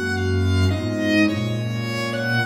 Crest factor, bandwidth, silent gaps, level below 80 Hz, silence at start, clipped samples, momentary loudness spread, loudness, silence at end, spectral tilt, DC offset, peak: 16 dB; 14 kHz; none; -48 dBFS; 0 s; under 0.1%; 6 LU; -21 LUFS; 0 s; -6 dB/octave; under 0.1%; -6 dBFS